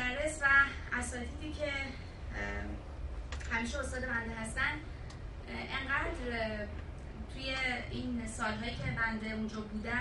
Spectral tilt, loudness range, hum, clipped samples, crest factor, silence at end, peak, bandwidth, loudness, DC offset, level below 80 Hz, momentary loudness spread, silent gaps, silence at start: -4.5 dB/octave; 5 LU; none; under 0.1%; 22 dB; 0 s; -14 dBFS; 11.5 kHz; -35 LUFS; under 0.1%; -44 dBFS; 12 LU; none; 0 s